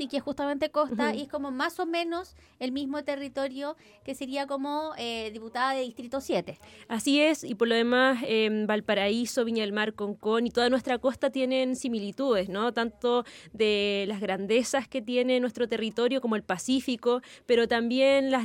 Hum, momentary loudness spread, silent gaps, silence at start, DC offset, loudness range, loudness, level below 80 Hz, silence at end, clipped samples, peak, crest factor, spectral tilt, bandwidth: none; 10 LU; none; 0 s; under 0.1%; 7 LU; -28 LUFS; -64 dBFS; 0 s; under 0.1%; -12 dBFS; 16 dB; -4 dB/octave; 17 kHz